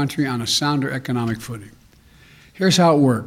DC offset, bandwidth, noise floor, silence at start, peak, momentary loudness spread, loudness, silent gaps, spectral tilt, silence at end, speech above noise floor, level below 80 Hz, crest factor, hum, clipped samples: under 0.1%; 16 kHz; -50 dBFS; 0 s; -4 dBFS; 14 LU; -19 LUFS; none; -5 dB/octave; 0 s; 31 dB; -54 dBFS; 16 dB; none; under 0.1%